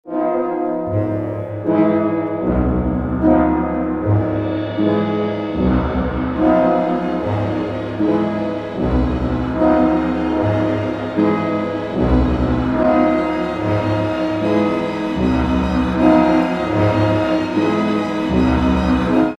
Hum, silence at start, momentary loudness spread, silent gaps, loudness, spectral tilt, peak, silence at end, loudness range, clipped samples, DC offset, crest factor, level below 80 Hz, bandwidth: none; 0.05 s; 6 LU; none; -18 LUFS; -8.5 dB/octave; -2 dBFS; 0.05 s; 2 LU; under 0.1%; under 0.1%; 16 dB; -30 dBFS; 8 kHz